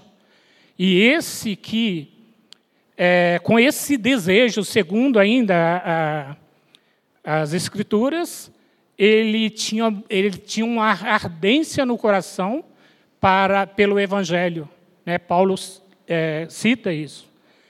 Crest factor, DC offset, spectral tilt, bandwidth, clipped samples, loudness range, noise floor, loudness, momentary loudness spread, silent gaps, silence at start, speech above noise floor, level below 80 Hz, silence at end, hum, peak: 20 dB; under 0.1%; -5 dB/octave; 15 kHz; under 0.1%; 5 LU; -58 dBFS; -19 LUFS; 11 LU; none; 0.8 s; 39 dB; -64 dBFS; 0.5 s; none; 0 dBFS